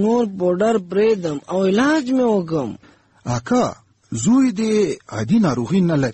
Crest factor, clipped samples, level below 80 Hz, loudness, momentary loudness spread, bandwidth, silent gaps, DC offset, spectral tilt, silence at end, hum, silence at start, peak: 12 dB; under 0.1%; -52 dBFS; -19 LUFS; 9 LU; 8.6 kHz; none; under 0.1%; -6.5 dB/octave; 0 s; none; 0 s; -6 dBFS